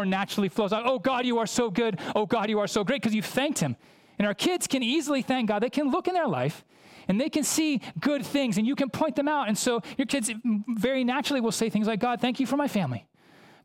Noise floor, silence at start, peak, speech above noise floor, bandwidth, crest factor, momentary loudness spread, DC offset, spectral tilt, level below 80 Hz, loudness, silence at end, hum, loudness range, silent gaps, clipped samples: -55 dBFS; 0 s; -12 dBFS; 29 dB; 17 kHz; 14 dB; 4 LU; under 0.1%; -4.5 dB/octave; -64 dBFS; -27 LUFS; 0.65 s; none; 1 LU; none; under 0.1%